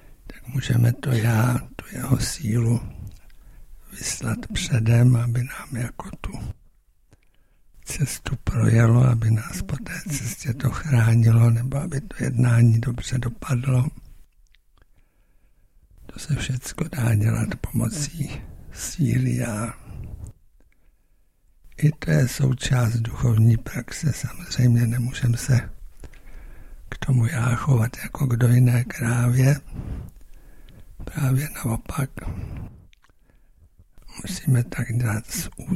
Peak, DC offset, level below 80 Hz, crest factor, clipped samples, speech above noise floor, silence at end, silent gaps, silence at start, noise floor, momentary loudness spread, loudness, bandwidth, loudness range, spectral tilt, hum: -4 dBFS; under 0.1%; -40 dBFS; 18 dB; under 0.1%; 38 dB; 0 s; none; 0.1 s; -60 dBFS; 18 LU; -23 LUFS; 14 kHz; 9 LU; -6 dB/octave; none